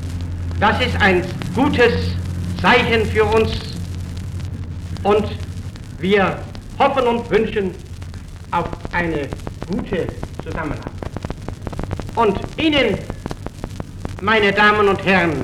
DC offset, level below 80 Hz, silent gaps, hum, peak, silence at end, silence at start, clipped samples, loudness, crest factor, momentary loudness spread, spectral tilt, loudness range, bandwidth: under 0.1%; -34 dBFS; none; none; -2 dBFS; 0 s; 0 s; under 0.1%; -18 LUFS; 18 dB; 16 LU; -6 dB/octave; 8 LU; 14 kHz